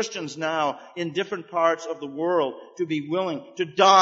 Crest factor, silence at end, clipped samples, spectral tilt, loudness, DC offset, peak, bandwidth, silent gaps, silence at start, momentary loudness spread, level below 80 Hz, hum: 20 dB; 0 s; under 0.1%; -4 dB/octave; -25 LUFS; under 0.1%; -4 dBFS; 8 kHz; none; 0 s; 8 LU; -80 dBFS; none